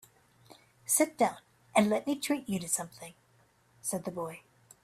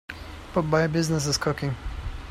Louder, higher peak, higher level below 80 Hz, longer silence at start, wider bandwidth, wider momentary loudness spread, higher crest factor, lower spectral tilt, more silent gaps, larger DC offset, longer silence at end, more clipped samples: second, -31 LUFS vs -26 LUFS; about the same, -10 dBFS vs -8 dBFS; second, -72 dBFS vs -40 dBFS; first, 0.5 s vs 0.1 s; about the same, 15.5 kHz vs 15.5 kHz; first, 20 LU vs 14 LU; about the same, 22 dB vs 18 dB; second, -3.5 dB/octave vs -5 dB/octave; neither; neither; first, 0.45 s vs 0 s; neither